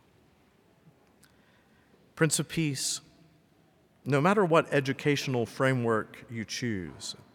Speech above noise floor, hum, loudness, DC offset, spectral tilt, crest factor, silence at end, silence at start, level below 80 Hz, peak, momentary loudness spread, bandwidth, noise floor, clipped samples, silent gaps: 36 dB; none; -29 LUFS; under 0.1%; -4.5 dB/octave; 22 dB; 0.2 s; 2.15 s; -68 dBFS; -10 dBFS; 14 LU; 19 kHz; -64 dBFS; under 0.1%; none